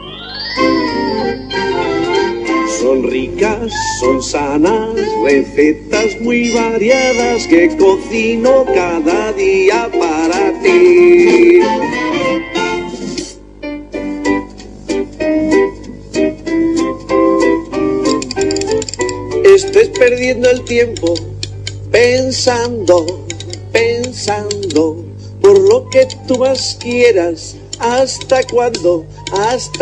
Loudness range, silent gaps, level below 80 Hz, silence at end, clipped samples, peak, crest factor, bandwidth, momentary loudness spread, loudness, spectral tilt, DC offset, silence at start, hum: 6 LU; none; -38 dBFS; 0 s; 0.4%; 0 dBFS; 12 dB; 10 kHz; 12 LU; -13 LUFS; -4.5 dB/octave; under 0.1%; 0 s; 50 Hz at -30 dBFS